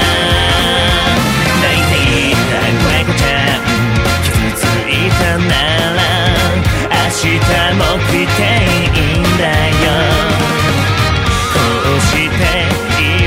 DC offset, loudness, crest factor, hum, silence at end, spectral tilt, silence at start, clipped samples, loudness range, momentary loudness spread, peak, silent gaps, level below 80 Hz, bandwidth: under 0.1%; -11 LUFS; 12 dB; none; 0 s; -4.5 dB/octave; 0 s; under 0.1%; 1 LU; 2 LU; 0 dBFS; none; -22 dBFS; 16.5 kHz